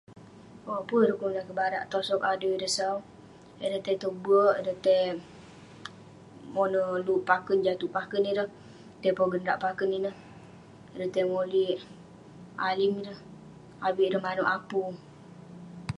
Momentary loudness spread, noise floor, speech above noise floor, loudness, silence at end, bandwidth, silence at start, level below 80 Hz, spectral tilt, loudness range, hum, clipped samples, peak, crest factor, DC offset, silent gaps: 21 LU; -50 dBFS; 22 dB; -28 LUFS; 0.05 s; 11.5 kHz; 0.1 s; -66 dBFS; -4.5 dB/octave; 3 LU; none; under 0.1%; -10 dBFS; 20 dB; under 0.1%; none